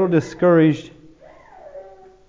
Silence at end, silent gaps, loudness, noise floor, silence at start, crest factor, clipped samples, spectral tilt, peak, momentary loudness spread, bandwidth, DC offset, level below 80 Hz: 0.45 s; none; -17 LUFS; -46 dBFS; 0 s; 16 dB; under 0.1%; -8 dB/octave; -4 dBFS; 26 LU; 7.6 kHz; under 0.1%; -58 dBFS